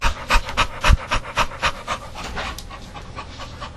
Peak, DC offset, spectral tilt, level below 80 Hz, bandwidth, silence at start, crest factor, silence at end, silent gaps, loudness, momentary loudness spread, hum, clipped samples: -2 dBFS; under 0.1%; -3.5 dB/octave; -26 dBFS; 13 kHz; 0 s; 22 dB; 0 s; none; -22 LUFS; 16 LU; none; under 0.1%